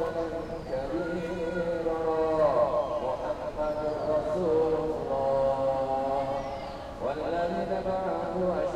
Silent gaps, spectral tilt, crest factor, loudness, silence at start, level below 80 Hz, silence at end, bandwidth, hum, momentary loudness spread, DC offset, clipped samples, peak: none; -7 dB/octave; 16 dB; -29 LUFS; 0 s; -48 dBFS; 0 s; 11.5 kHz; none; 8 LU; under 0.1%; under 0.1%; -14 dBFS